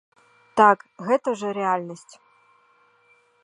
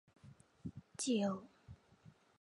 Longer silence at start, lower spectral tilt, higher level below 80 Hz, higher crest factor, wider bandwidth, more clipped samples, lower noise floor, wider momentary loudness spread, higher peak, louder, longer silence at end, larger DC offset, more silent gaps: first, 0.55 s vs 0.25 s; about the same, -5.5 dB/octave vs -4.5 dB/octave; about the same, -74 dBFS vs -70 dBFS; about the same, 22 dB vs 18 dB; about the same, 11 kHz vs 11 kHz; neither; second, -61 dBFS vs -66 dBFS; second, 15 LU vs 26 LU; first, -2 dBFS vs -26 dBFS; first, -22 LUFS vs -41 LUFS; first, 1.5 s vs 0.3 s; neither; neither